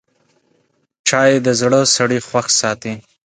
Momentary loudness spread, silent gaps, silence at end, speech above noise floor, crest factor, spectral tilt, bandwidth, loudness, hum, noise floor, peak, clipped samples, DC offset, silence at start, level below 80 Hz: 8 LU; none; 0.25 s; 47 dB; 18 dB; -3 dB/octave; 9.6 kHz; -15 LUFS; none; -62 dBFS; 0 dBFS; under 0.1%; under 0.1%; 1.05 s; -58 dBFS